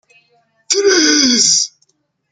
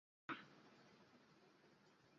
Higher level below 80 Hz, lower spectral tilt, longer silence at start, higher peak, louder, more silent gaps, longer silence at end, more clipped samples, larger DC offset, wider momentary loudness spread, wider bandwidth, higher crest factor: first, -60 dBFS vs under -90 dBFS; second, 0 dB/octave vs -2 dB/octave; first, 0.7 s vs 0.3 s; first, 0 dBFS vs -36 dBFS; first, -11 LUFS vs -56 LUFS; neither; first, 0.65 s vs 0 s; neither; neither; second, 7 LU vs 15 LU; first, 11 kHz vs 7.2 kHz; second, 16 dB vs 26 dB